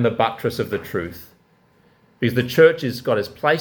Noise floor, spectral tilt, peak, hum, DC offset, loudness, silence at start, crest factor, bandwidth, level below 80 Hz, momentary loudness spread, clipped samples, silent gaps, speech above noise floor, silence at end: -57 dBFS; -6 dB/octave; -2 dBFS; none; under 0.1%; -20 LUFS; 0 s; 20 dB; 19 kHz; -54 dBFS; 13 LU; under 0.1%; none; 38 dB; 0 s